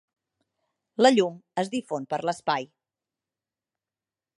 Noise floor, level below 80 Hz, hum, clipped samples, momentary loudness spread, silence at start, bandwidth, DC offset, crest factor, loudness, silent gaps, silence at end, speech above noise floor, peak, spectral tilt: under -90 dBFS; -80 dBFS; none; under 0.1%; 11 LU; 1 s; 11.5 kHz; under 0.1%; 22 dB; -25 LUFS; none; 1.75 s; over 65 dB; -6 dBFS; -4.5 dB/octave